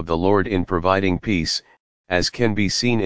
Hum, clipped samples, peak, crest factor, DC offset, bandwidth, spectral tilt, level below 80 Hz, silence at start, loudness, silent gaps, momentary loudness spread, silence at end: none; under 0.1%; -2 dBFS; 20 dB; 2%; 8 kHz; -5 dB/octave; -38 dBFS; 0 s; -20 LUFS; 1.80-2.04 s; 4 LU; 0 s